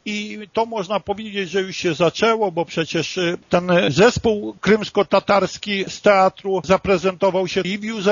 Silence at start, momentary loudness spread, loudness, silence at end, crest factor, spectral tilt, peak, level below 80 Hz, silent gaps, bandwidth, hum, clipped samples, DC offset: 0.05 s; 9 LU; -19 LUFS; 0 s; 18 dB; -3.5 dB/octave; -2 dBFS; -48 dBFS; none; 7.4 kHz; none; under 0.1%; under 0.1%